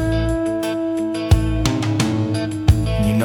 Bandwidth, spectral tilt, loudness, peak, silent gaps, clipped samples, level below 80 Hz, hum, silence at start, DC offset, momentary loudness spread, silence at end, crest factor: 18 kHz; -6.5 dB/octave; -19 LUFS; -2 dBFS; none; under 0.1%; -26 dBFS; none; 0 s; under 0.1%; 4 LU; 0 s; 16 dB